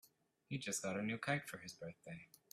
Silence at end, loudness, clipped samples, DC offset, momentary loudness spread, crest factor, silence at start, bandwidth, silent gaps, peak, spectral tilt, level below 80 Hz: 0.25 s; -44 LUFS; under 0.1%; under 0.1%; 14 LU; 22 dB; 0.05 s; 15.5 kHz; none; -24 dBFS; -4 dB/octave; -80 dBFS